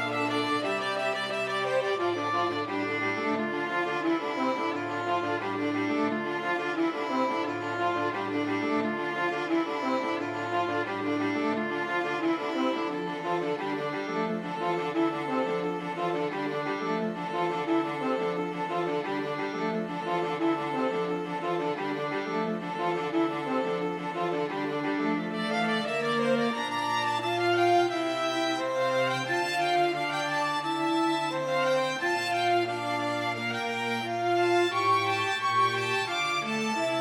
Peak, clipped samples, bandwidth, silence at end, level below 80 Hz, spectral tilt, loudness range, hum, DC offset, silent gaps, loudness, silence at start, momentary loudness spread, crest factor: -12 dBFS; under 0.1%; 15.5 kHz; 0 s; -78 dBFS; -5 dB/octave; 3 LU; none; under 0.1%; none; -29 LUFS; 0 s; 5 LU; 16 dB